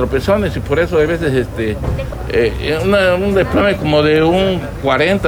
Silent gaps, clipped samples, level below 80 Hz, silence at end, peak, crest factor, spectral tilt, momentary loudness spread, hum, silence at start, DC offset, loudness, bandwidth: none; under 0.1%; -28 dBFS; 0 s; -2 dBFS; 12 dB; -6.5 dB/octave; 7 LU; none; 0 s; under 0.1%; -15 LUFS; 19.5 kHz